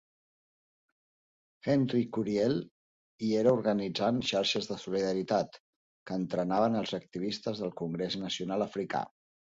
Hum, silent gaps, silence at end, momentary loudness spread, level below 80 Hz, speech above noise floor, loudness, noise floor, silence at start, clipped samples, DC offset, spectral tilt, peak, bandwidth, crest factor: none; 2.71-3.19 s, 5.60-6.06 s; 0.5 s; 8 LU; -68 dBFS; over 59 dB; -31 LUFS; under -90 dBFS; 1.65 s; under 0.1%; under 0.1%; -5.5 dB/octave; -14 dBFS; 7.8 kHz; 20 dB